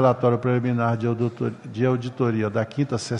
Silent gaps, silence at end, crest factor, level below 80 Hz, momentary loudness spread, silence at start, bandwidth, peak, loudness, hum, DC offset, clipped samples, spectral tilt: none; 0 s; 16 dB; -62 dBFS; 5 LU; 0 s; 10.5 kHz; -6 dBFS; -24 LUFS; none; under 0.1%; under 0.1%; -7.5 dB/octave